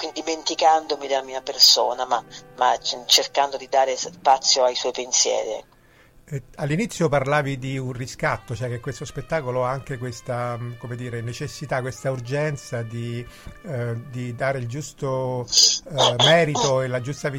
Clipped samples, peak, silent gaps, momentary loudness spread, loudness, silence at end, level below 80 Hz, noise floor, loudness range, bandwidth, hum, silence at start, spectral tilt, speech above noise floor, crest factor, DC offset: under 0.1%; -2 dBFS; none; 16 LU; -21 LUFS; 0 s; -52 dBFS; -53 dBFS; 10 LU; 16.5 kHz; none; 0 s; -3 dB/octave; 30 dB; 20 dB; under 0.1%